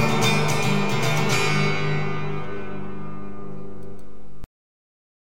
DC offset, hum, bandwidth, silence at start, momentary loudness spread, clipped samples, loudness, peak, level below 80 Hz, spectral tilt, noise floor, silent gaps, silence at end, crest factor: 6%; 50 Hz at -35 dBFS; 16.5 kHz; 0 s; 20 LU; under 0.1%; -23 LUFS; -6 dBFS; -48 dBFS; -4.5 dB/octave; -45 dBFS; none; 0.8 s; 18 dB